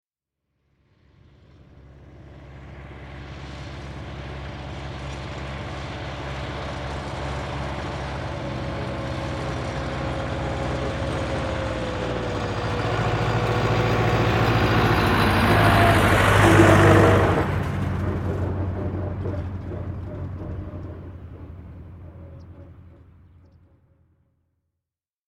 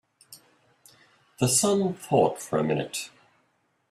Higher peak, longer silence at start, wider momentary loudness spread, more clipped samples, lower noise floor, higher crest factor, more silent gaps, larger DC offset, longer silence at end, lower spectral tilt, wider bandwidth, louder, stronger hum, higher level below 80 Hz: first, -2 dBFS vs -8 dBFS; first, 1.75 s vs 0.3 s; first, 23 LU vs 12 LU; neither; first, -87 dBFS vs -71 dBFS; about the same, 22 dB vs 20 dB; neither; neither; first, 2.35 s vs 0.85 s; first, -6 dB/octave vs -4.5 dB/octave; about the same, 16 kHz vs 15.5 kHz; first, -22 LUFS vs -25 LUFS; neither; first, -36 dBFS vs -64 dBFS